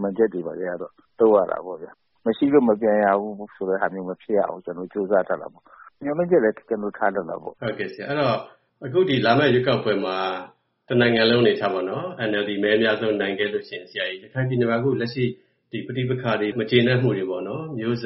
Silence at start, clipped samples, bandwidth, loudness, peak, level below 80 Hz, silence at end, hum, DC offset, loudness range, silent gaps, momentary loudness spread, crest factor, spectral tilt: 0 s; under 0.1%; 5.8 kHz; -22 LUFS; -4 dBFS; -62 dBFS; 0 s; none; under 0.1%; 4 LU; none; 13 LU; 18 dB; -4.5 dB/octave